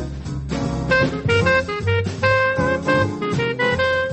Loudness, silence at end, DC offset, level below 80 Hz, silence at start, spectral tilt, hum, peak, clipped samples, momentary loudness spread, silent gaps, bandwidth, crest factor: -19 LUFS; 0 s; under 0.1%; -38 dBFS; 0 s; -6 dB/octave; none; -6 dBFS; under 0.1%; 8 LU; none; 8.6 kHz; 14 dB